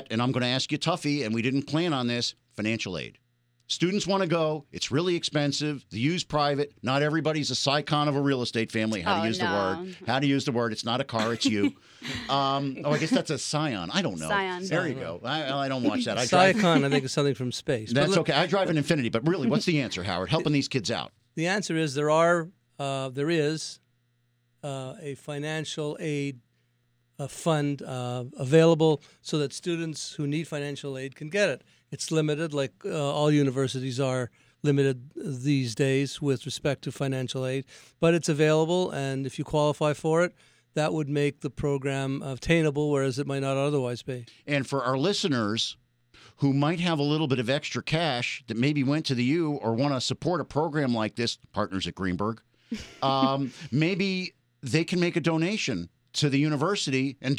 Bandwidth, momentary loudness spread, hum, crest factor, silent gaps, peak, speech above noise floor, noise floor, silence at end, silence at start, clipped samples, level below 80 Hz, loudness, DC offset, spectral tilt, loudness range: 14.5 kHz; 9 LU; none; 20 dB; none; -6 dBFS; 44 dB; -70 dBFS; 0 s; 0 s; under 0.1%; -60 dBFS; -27 LUFS; under 0.1%; -5 dB/octave; 4 LU